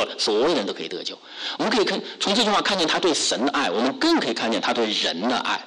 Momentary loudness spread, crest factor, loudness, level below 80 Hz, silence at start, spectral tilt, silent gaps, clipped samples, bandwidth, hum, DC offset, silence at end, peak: 9 LU; 12 dB; -22 LUFS; -62 dBFS; 0 s; -2.5 dB/octave; none; under 0.1%; 11 kHz; none; under 0.1%; 0 s; -10 dBFS